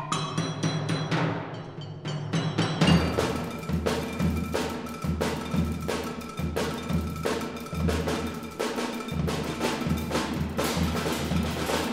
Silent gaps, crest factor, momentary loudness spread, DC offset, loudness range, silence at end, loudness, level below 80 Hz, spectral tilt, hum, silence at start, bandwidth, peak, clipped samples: none; 20 dB; 6 LU; under 0.1%; 3 LU; 0 s; -29 LUFS; -42 dBFS; -5.5 dB/octave; none; 0 s; 16 kHz; -8 dBFS; under 0.1%